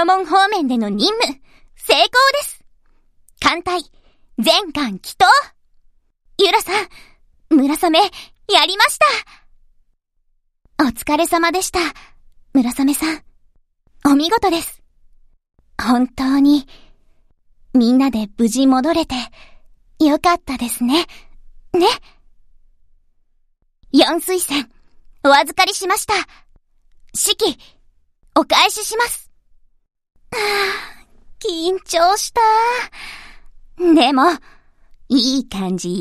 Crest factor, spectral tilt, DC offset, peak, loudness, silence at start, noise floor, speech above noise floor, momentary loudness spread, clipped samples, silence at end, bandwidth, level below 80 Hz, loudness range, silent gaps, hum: 18 dB; -2.5 dB/octave; under 0.1%; 0 dBFS; -16 LUFS; 0 s; -63 dBFS; 47 dB; 14 LU; under 0.1%; 0 s; 15.5 kHz; -46 dBFS; 4 LU; none; none